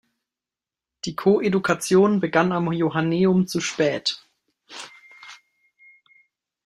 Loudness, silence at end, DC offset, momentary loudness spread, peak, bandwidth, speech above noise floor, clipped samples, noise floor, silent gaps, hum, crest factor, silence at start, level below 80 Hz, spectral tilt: -21 LUFS; 1.3 s; under 0.1%; 20 LU; -4 dBFS; 13.5 kHz; 69 dB; under 0.1%; -90 dBFS; none; none; 20 dB; 1.05 s; -64 dBFS; -5.5 dB/octave